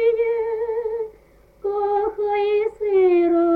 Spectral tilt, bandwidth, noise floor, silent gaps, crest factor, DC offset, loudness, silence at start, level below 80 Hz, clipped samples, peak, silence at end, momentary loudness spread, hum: -7 dB/octave; 4.8 kHz; -52 dBFS; none; 10 dB; under 0.1%; -21 LUFS; 0 s; -54 dBFS; under 0.1%; -10 dBFS; 0 s; 11 LU; none